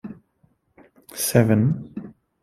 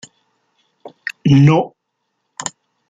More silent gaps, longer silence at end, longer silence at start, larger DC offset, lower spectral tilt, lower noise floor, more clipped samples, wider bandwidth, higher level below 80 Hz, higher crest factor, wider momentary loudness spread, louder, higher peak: neither; about the same, 0.3 s vs 0.4 s; second, 0.05 s vs 0.85 s; neither; about the same, -6 dB/octave vs -6.5 dB/octave; second, -64 dBFS vs -72 dBFS; neither; first, 16 kHz vs 9.2 kHz; about the same, -56 dBFS vs -52 dBFS; about the same, 22 dB vs 18 dB; first, 21 LU vs 18 LU; second, -20 LUFS vs -15 LUFS; about the same, -2 dBFS vs 0 dBFS